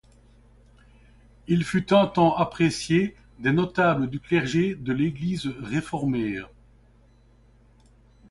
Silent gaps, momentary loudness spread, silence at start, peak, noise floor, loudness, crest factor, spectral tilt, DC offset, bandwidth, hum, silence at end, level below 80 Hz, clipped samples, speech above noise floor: none; 9 LU; 1.5 s; -6 dBFS; -56 dBFS; -24 LUFS; 20 dB; -6.5 dB/octave; under 0.1%; 11.5 kHz; none; 1.85 s; -52 dBFS; under 0.1%; 33 dB